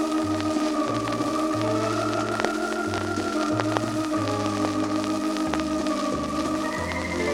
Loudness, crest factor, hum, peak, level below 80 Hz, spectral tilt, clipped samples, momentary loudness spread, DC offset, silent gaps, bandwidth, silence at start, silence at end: -26 LUFS; 24 dB; none; -2 dBFS; -50 dBFS; -5 dB/octave; under 0.1%; 2 LU; under 0.1%; none; 16 kHz; 0 s; 0 s